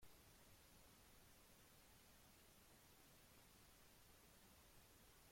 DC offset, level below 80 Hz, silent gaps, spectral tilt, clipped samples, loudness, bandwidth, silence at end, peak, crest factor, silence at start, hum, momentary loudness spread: under 0.1%; -78 dBFS; none; -3 dB/octave; under 0.1%; -69 LUFS; 16.5 kHz; 0 s; -54 dBFS; 16 dB; 0 s; none; 0 LU